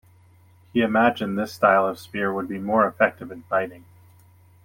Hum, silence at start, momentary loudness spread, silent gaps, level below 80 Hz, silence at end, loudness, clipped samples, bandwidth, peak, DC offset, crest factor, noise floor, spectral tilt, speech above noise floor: none; 0.75 s; 9 LU; none; -66 dBFS; 0.85 s; -22 LUFS; under 0.1%; 16.5 kHz; -4 dBFS; under 0.1%; 20 dB; -54 dBFS; -6.5 dB/octave; 32 dB